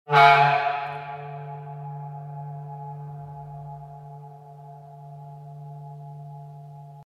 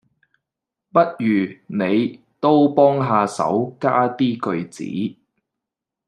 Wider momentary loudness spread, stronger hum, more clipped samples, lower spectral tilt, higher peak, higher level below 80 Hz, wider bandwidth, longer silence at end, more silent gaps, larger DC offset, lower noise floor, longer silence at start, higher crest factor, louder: first, 25 LU vs 11 LU; neither; neither; about the same, -6 dB/octave vs -7 dB/octave; about the same, -2 dBFS vs -2 dBFS; about the same, -66 dBFS vs -68 dBFS; first, 14 kHz vs 10.5 kHz; second, 0 s vs 0.95 s; neither; neither; second, -44 dBFS vs -85 dBFS; second, 0.05 s vs 0.95 s; first, 24 dB vs 18 dB; second, -22 LUFS vs -19 LUFS